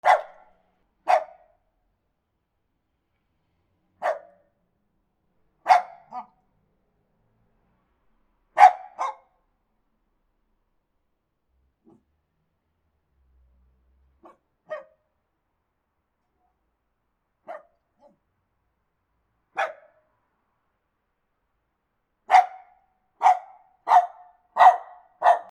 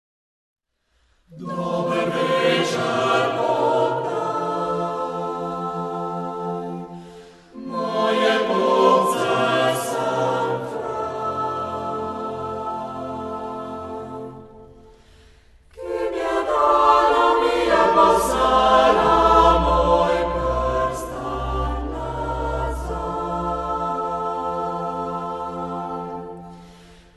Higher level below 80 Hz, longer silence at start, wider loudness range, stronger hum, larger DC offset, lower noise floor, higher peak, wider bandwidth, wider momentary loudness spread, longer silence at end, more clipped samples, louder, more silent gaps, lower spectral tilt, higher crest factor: second, -74 dBFS vs -38 dBFS; second, 0.05 s vs 1.3 s; first, 24 LU vs 12 LU; neither; neither; first, -77 dBFS vs -66 dBFS; about the same, 0 dBFS vs -2 dBFS; second, 10 kHz vs 12.5 kHz; first, 24 LU vs 15 LU; about the same, 0.1 s vs 0.2 s; neither; about the same, -21 LUFS vs -21 LUFS; neither; second, -1 dB/octave vs -5 dB/octave; first, 28 dB vs 20 dB